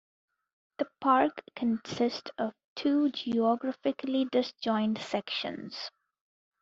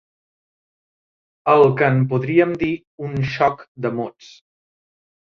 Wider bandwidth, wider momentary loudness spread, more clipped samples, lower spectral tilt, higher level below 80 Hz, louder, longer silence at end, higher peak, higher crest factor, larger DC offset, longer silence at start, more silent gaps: first, 7.8 kHz vs 6.8 kHz; second, 11 LU vs 14 LU; neither; second, -3 dB/octave vs -8.5 dB/octave; second, -74 dBFS vs -54 dBFS; second, -31 LUFS vs -19 LUFS; second, 0.75 s vs 1.1 s; second, -10 dBFS vs -2 dBFS; about the same, 20 dB vs 18 dB; neither; second, 0.8 s vs 1.45 s; second, 2.65-2.76 s vs 2.87-2.98 s, 3.68-3.75 s